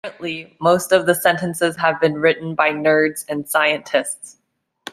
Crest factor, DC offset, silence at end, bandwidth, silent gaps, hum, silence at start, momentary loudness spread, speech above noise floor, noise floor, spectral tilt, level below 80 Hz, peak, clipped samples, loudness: 18 dB; under 0.1%; 0 s; 15.5 kHz; none; none; 0.05 s; 12 LU; 22 dB; -40 dBFS; -4 dB/octave; -62 dBFS; -2 dBFS; under 0.1%; -18 LUFS